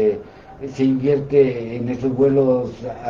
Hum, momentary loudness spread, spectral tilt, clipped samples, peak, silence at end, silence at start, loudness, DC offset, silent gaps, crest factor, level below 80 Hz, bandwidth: none; 13 LU; -9 dB/octave; under 0.1%; -4 dBFS; 0 s; 0 s; -19 LUFS; under 0.1%; none; 14 dB; -50 dBFS; 7.2 kHz